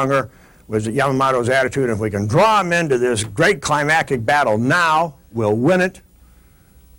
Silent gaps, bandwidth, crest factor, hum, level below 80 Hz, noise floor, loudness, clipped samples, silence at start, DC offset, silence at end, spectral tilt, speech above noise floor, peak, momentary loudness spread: none; 16.5 kHz; 12 dB; none; -48 dBFS; -49 dBFS; -17 LUFS; under 0.1%; 0 s; under 0.1%; 1 s; -5 dB/octave; 32 dB; -6 dBFS; 7 LU